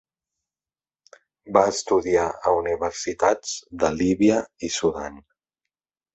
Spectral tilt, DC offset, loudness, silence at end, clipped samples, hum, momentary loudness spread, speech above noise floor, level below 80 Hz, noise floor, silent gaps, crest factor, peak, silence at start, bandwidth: -4.5 dB/octave; under 0.1%; -22 LUFS; 0.95 s; under 0.1%; none; 8 LU; over 68 dB; -52 dBFS; under -90 dBFS; none; 22 dB; -2 dBFS; 1.45 s; 8.2 kHz